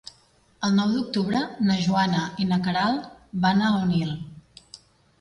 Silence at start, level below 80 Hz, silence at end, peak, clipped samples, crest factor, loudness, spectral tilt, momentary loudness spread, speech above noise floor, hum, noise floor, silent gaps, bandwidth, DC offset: 0.6 s; -56 dBFS; 0.45 s; -8 dBFS; under 0.1%; 16 dB; -24 LUFS; -6 dB/octave; 9 LU; 37 dB; none; -59 dBFS; none; 11 kHz; under 0.1%